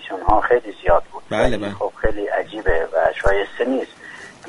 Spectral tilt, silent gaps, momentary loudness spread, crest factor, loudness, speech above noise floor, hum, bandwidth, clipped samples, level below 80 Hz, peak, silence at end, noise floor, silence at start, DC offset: -6 dB/octave; none; 8 LU; 18 dB; -20 LUFS; 20 dB; none; 10.5 kHz; under 0.1%; -32 dBFS; -2 dBFS; 0 s; -39 dBFS; 0 s; under 0.1%